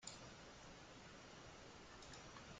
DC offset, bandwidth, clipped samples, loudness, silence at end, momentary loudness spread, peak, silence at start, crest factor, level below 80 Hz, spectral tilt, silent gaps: under 0.1%; 9 kHz; under 0.1%; -58 LUFS; 0 s; 2 LU; -36 dBFS; 0 s; 24 dB; -72 dBFS; -3 dB/octave; none